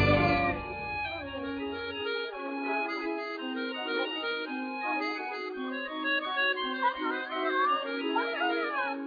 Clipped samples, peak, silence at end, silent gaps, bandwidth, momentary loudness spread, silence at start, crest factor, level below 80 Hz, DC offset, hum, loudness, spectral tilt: under 0.1%; -12 dBFS; 0 s; none; 5 kHz; 8 LU; 0 s; 18 dB; -52 dBFS; under 0.1%; none; -31 LUFS; -7 dB/octave